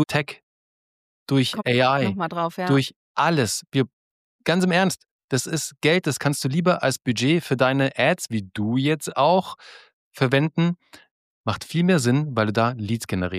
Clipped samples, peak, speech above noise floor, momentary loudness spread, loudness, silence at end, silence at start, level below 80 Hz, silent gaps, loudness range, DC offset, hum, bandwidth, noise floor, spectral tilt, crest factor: under 0.1%; -6 dBFS; over 68 dB; 9 LU; -22 LUFS; 0 s; 0 s; -62 dBFS; 0.43-1.26 s, 2.96-3.15 s, 3.93-4.39 s, 5.11-5.28 s, 9.93-10.11 s, 11.11-11.44 s; 2 LU; under 0.1%; none; 15.5 kHz; under -90 dBFS; -5 dB/octave; 16 dB